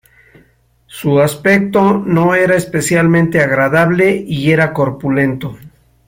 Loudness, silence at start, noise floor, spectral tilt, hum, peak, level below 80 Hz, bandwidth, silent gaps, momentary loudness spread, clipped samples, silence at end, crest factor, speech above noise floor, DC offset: -12 LUFS; 0.95 s; -52 dBFS; -6 dB/octave; none; 0 dBFS; -46 dBFS; 16.5 kHz; none; 5 LU; under 0.1%; 0.4 s; 12 dB; 40 dB; under 0.1%